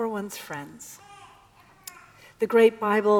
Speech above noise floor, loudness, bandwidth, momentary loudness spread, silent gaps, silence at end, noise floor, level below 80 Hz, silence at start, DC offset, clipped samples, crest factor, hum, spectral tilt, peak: 32 dB; -23 LUFS; 19 kHz; 24 LU; none; 0 s; -55 dBFS; -70 dBFS; 0 s; under 0.1%; under 0.1%; 20 dB; none; -5 dB/octave; -6 dBFS